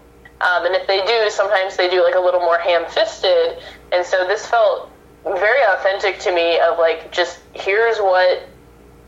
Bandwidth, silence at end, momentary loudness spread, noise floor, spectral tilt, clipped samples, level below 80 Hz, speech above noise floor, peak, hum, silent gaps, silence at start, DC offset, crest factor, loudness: 8 kHz; 0.6 s; 7 LU; -45 dBFS; -2 dB/octave; under 0.1%; -52 dBFS; 28 dB; -4 dBFS; none; none; 0.4 s; under 0.1%; 14 dB; -17 LUFS